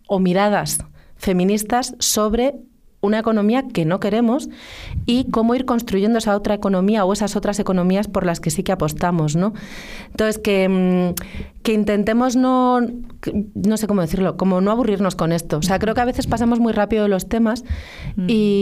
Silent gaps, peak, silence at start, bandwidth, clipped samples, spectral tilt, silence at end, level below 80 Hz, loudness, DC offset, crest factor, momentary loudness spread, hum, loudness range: none; -4 dBFS; 0.1 s; 15.5 kHz; under 0.1%; -5.5 dB/octave; 0 s; -38 dBFS; -19 LUFS; under 0.1%; 14 dB; 9 LU; none; 2 LU